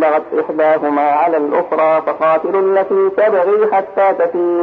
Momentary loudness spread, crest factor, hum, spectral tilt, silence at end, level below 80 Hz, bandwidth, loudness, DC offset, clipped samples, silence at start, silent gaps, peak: 3 LU; 10 dB; none; -8 dB/octave; 0 s; -64 dBFS; 4.9 kHz; -14 LUFS; under 0.1%; under 0.1%; 0 s; none; -2 dBFS